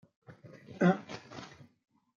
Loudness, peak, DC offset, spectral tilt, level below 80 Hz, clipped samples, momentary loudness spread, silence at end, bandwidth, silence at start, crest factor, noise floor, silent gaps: -30 LUFS; -14 dBFS; under 0.1%; -7.5 dB/octave; -78 dBFS; under 0.1%; 25 LU; 0.75 s; 7.2 kHz; 0.3 s; 22 dB; -53 dBFS; none